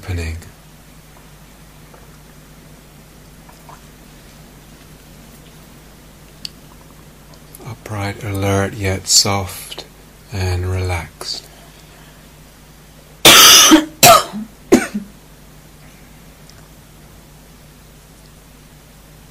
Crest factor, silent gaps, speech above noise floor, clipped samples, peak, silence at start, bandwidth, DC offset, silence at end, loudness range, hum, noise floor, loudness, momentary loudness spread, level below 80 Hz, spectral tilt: 18 dB; none; 23 dB; 0.2%; 0 dBFS; 0.05 s; 15.5 kHz; under 0.1%; 4.25 s; 17 LU; none; -42 dBFS; -11 LUFS; 28 LU; -42 dBFS; -2 dB/octave